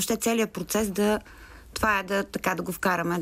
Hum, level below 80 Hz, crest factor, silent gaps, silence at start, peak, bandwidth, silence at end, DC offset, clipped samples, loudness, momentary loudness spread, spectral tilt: none; -50 dBFS; 16 dB; none; 0 s; -10 dBFS; 16 kHz; 0 s; under 0.1%; under 0.1%; -26 LUFS; 4 LU; -4 dB/octave